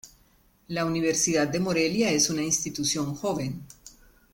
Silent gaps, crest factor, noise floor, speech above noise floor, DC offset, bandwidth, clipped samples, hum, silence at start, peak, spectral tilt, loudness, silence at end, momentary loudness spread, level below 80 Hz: none; 18 dB; -62 dBFS; 36 dB; under 0.1%; 17 kHz; under 0.1%; none; 0.05 s; -10 dBFS; -3.5 dB/octave; -25 LUFS; 0.45 s; 11 LU; -56 dBFS